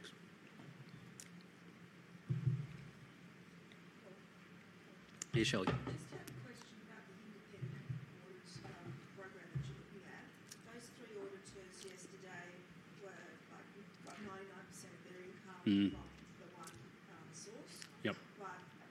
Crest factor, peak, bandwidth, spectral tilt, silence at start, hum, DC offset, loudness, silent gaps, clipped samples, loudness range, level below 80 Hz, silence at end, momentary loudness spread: 24 dB; -24 dBFS; 15.5 kHz; -5.5 dB/octave; 0 s; none; under 0.1%; -47 LUFS; none; under 0.1%; 11 LU; -72 dBFS; 0 s; 19 LU